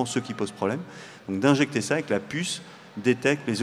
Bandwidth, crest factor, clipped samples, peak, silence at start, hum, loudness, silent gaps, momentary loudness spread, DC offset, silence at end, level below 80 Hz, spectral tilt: 14 kHz; 20 dB; under 0.1%; -6 dBFS; 0 s; none; -26 LUFS; none; 12 LU; under 0.1%; 0 s; -70 dBFS; -5 dB/octave